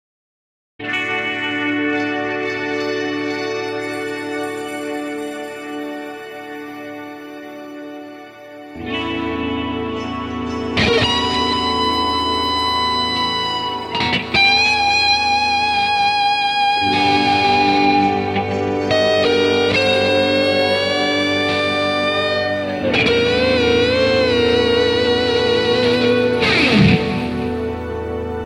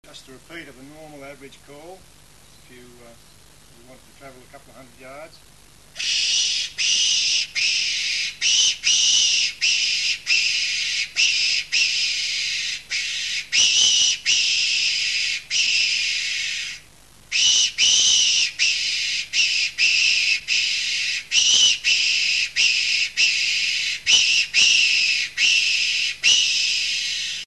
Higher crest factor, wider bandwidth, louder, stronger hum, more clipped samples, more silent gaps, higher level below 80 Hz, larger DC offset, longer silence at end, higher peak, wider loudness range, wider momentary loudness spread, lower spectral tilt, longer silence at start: about the same, 16 dB vs 18 dB; first, 14 kHz vs 12.5 kHz; about the same, -17 LUFS vs -17 LUFS; neither; neither; neither; first, -42 dBFS vs -60 dBFS; second, under 0.1% vs 0.2%; about the same, 0 s vs 0 s; about the same, -2 dBFS vs -4 dBFS; first, 12 LU vs 4 LU; first, 15 LU vs 8 LU; first, -4.5 dB/octave vs 3 dB/octave; first, 0.8 s vs 0.1 s